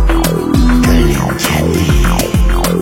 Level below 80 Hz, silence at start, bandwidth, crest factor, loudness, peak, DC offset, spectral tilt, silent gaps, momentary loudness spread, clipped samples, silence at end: -14 dBFS; 0 s; 16.5 kHz; 10 dB; -12 LUFS; 0 dBFS; under 0.1%; -5.5 dB/octave; none; 3 LU; under 0.1%; 0 s